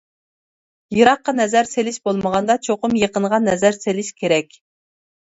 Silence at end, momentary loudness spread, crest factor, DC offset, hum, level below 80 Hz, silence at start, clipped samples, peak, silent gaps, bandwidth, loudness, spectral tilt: 0.95 s; 8 LU; 20 dB; under 0.1%; none; -56 dBFS; 0.9 s; under 0.1%; 0 dBFS; none; 8 kHz; -18 LUFS; -4.5 dB/octave